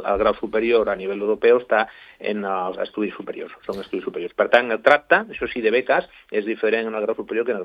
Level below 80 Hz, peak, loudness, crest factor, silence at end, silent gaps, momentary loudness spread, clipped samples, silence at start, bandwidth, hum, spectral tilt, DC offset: -52 dBFS; 0 dBFS; -21 LUFS; 22 dB; 0 s; none; 12 LU; under 0.1%; 0 s; 7 kHz; none; -6 dB/octave; under 0.1%